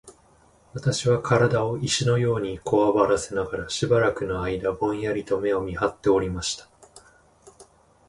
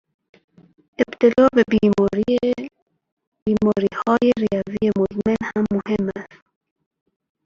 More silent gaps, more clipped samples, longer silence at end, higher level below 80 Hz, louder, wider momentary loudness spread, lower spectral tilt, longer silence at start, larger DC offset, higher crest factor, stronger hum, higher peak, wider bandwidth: second, none vs 2.82-2.86 s, 3.12-3.17 s, 3.27-3.32 s, 3.42-3.46 s; neither; second, 0.45 s vs 1.2 s; about the same, -48 dBFS vs -50 dBFS; second, -24 LUFS vs -19 LUFS; about the same, 8 LU vs 9 LU; second, -5 dB/octave vs -7.5 dB/octave; second, 0.05 s vs 1 s; neither; about the same, 18 dB vs 18 dB; neither; second, -6 dBFS vs -2 dBFS; first, 11.5 kHz vs 7.2 kHz